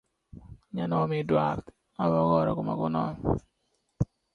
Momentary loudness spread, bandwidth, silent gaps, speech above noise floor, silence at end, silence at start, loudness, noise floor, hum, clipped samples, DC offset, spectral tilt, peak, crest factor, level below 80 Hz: 10 LU; 6.8 kHz; none; 48 dB; 0.3 s; 0.35 s; -28 LUFS; -75 dBFS; none; under 0.1%; under 0.1%; -9.5 dB/octave; -10 dBFS; 18 dB; -48 dBFS